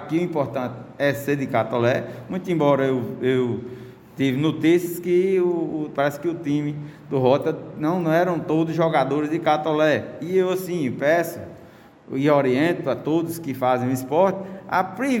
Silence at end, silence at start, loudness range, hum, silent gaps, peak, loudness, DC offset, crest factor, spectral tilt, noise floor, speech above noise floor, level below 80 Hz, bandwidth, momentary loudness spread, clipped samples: 0 s; 0 s; 2 LU; none; none; -4 dBFS; -22 LUFS; under 0.1%; 18 dB; -7 dB/octave; -47 dBFS; 25 dB; -62 dBFS; 17 kHz; 9 LU; under 0.1%